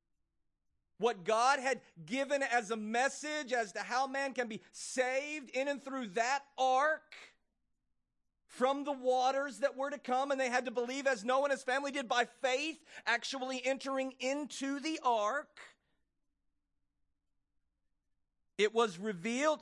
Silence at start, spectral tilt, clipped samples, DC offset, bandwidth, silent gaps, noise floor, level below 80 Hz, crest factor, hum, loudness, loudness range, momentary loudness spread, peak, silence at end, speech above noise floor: 1 s; -2.5 dB/octave; under 0.1%; under 0.1%; 12 kHz; none; -83 dBFS; -86 dBFS; 20 dB; none; -35 LUFS; 5 LU; 8 LU; -16 dBFS; 0 s; 48 dB